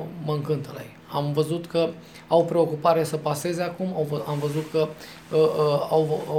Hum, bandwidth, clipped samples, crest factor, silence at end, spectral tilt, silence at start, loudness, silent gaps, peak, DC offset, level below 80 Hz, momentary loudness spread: none; 16.5 kHz; under 0.1%; 18 dB; 0 s; -6.5 dB/octave; 0 s; -25 LUFS; none; -6 dBFS; under 0.1%; -64 dBFS; 8 LU